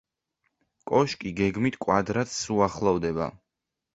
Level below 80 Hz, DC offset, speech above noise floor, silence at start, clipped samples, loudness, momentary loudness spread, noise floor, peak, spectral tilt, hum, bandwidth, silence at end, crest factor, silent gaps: -52 dBFS; under 0.1%; 60 dB; 0.85 s; under 0.1%; -26 LUFS; 6 LU; -85 dBFS; -6 dBFS; -5.5 dB/octave; none; 8 kHz; 0.6 s; 22 dB; none